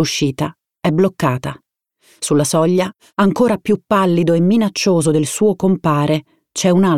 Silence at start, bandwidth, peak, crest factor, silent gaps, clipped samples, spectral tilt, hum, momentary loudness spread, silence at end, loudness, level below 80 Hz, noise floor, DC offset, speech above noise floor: 0 s; 15.5 kHz; -2 dBFS; 12 dB; none; under 0.1%; -5.5 dB/octave; none; 8 LU; 0 s; -16 LUFS; -52 dBFS; -56 dBFS; 0.3%; 41 dB